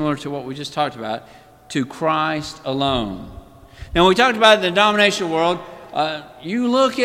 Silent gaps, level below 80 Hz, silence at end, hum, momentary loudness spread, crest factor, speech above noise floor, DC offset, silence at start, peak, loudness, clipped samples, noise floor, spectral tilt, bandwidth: none; -44 dBFS; 0 s; none; 15 LU; 20 dB; 21 dB; under 0.1%; 0 s; 0 dBFS; -18 LUFS; under 0.1%; -40 dBFS; -4.5 dB/octave; 16 kHz